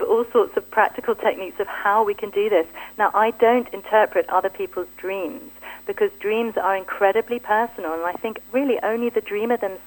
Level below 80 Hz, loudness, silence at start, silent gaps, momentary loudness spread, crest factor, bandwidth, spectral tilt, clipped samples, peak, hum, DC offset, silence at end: -60 dBFS; -22 LUFS; 0 s; none; 10 LU; 18 dB; 17 kHz; -4.5 dB/octave; under 0.1%; -4 dBFS; none; under 0.1%; 0 s